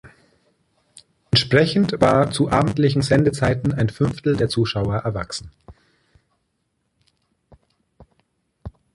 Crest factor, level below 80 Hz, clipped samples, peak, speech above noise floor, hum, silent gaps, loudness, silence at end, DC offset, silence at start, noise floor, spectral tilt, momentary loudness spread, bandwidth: 20 dB; -44 dBFS; under 0.1%; -2 dBFS; 53 dB; none; none; -19 LUFS; 0.25 s; under 0.1%; 0.05 s; -72 dBFS; -6 dB/octave; 13 LU; 11.5 kHz